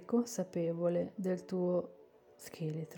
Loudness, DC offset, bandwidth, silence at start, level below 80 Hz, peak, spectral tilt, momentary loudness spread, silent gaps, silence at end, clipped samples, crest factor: -36 LUFS; under 0.1%; 19 kHz; 0 s; -84 dBFS; -20 dBFS; -7 dB/octave; 14 LU; none; 0 s; under 0.1%; 16 dB